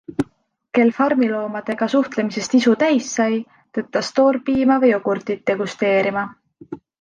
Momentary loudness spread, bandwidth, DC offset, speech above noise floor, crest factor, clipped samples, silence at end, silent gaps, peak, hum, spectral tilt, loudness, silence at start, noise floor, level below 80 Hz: 12 LU; 9.8 kHz; under 0.1%; 41 dB; 16 dB; under 0.1%; 0.25 s; none; -4 dBFS; none; -5 dB/octave; -19 LUFS; 0.1 s; -59 dBFS; -58 dBFS